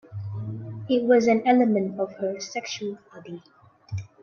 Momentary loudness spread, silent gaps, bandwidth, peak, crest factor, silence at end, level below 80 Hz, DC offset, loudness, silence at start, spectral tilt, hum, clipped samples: 22 LU; none; 7 kHz; -8 dBFS; 18 dB; 0.15 s; -66 dBFS; under 0.1%; -24 LUFS; 0.1 s; -6 dB/octave; none; under 0.1%